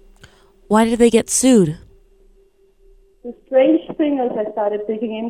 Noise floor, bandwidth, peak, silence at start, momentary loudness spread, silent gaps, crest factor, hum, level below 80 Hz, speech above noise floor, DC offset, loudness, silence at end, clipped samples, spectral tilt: -54 dBFS; 15.5 kHz; 0 dBFS; 0.7 s; 18 LU; none; 18 dB; none; -48 dBFS; 38 dB; under 0.1%; -16 LUFS; 0 s; under 0.1%; -4.5 dB/octave